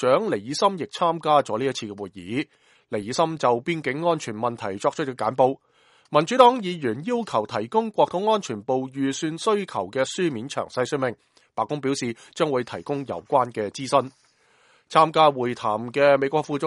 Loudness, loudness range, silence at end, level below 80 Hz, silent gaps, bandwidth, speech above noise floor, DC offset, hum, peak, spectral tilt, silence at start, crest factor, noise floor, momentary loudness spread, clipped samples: -23 LUFS; 4 LU; 0 s; -68 dBFS; none; 11.5 kHz; 37 dB; under 0.1%; none; -2 dBFS; -5 dB/octave; 0 s; 22 dB; -60 dBFS; 11 LU; under 0.1%